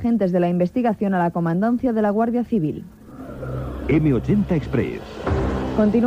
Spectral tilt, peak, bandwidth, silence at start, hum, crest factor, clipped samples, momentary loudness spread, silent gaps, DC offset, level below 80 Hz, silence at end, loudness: -9 dB/octave; -6 dBFS; 8.8 kHz; 0 s; none; 14 dB; under 0.1%; 11 LU; none; under 0.1%; -36 dBFS; 0 s; -21 LUFS